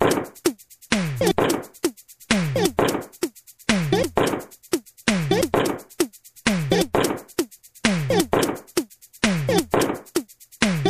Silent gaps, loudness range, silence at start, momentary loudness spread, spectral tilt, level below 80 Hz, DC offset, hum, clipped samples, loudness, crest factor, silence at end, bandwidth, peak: none; 1 LU; 0 s; 9 LU; -4.5 dB/octave; -46 dBFS; under 0.1%; none; under 0.1%; -23 LUFS; 20 dB; 0 s; 15.5 kHz; -4 dBFS